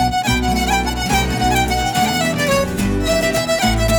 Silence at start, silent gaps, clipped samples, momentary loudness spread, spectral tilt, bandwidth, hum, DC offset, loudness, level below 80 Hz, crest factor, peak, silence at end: 0 s; none; under 0.1%; 1 LU; -4 dB/octave; 19 kHz; none; under 0.1%; -17 LUFS; -26 dBFS; 12 dB; -4 dBFS; 0 s